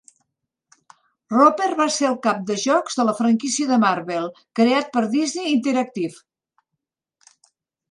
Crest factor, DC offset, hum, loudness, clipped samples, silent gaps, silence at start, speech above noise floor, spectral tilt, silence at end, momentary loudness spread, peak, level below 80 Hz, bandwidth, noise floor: 20 dB; under 0.1%; none; -20 LUFS; under 0.1%; none; 1.3 s; 62 dB; -4 dB/octave; 1.8 s; 10 LU; -2 dBFS; -74 dBFS; 11.5 kHz; -82 dBFS